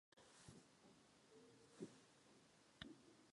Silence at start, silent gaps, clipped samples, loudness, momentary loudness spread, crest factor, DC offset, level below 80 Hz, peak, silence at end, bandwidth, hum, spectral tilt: 0.15 s; none; under 0.1%; -64 LUFS; 9 LU; 32 dB; under 0.1%; -84 dBFS; -34 dBFS; 0 s; 11 kHz; none; -4 dB/octave